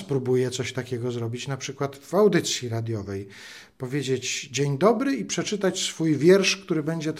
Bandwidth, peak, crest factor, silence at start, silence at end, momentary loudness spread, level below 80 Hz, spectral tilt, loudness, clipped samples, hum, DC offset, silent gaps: 15 kHz; -6 dBFS; 20 dB; 0 s; 0 s; 12 LU; -68 dBFS; -4.5 dB/octave; -24 LUFS; under 0.1%; none; under 0.1%; none